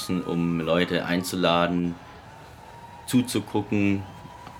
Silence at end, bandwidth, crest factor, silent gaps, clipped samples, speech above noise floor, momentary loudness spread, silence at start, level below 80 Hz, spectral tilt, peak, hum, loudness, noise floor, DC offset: 0 s; 17.5 kHz; 20 dB; none; under 0.1%; 21 dB; 22 LU; 0 s; -54 dBFS; -5.5 dB/octave; -6 dBFS; none; -25 LUFS; -45 dBFS; under 0.1%